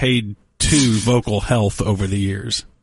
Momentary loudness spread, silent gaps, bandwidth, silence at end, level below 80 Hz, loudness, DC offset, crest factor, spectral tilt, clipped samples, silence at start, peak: 8 LU; none; 11.5 kHz; 0.2 s; -34 dBFS; -18 LUFS; under 0.1%; 16 dB; -4.5 dB/octave; under 0.1%; 0 s; -2 dBFS